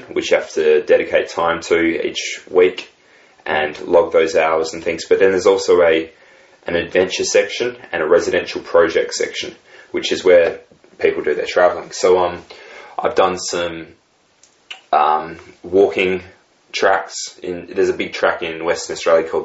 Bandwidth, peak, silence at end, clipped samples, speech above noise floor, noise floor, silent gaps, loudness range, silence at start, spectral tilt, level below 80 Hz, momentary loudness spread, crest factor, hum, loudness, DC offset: 8 kHz; 0 dBFS; 0 s; under 0.1%; 38 dB; -55 dBFS; none; 4 LU; 0 s; -3.5 dB/octave; -54 dBFS; 13 LU; 16 dB; none; -17 LUFS; under 0.1%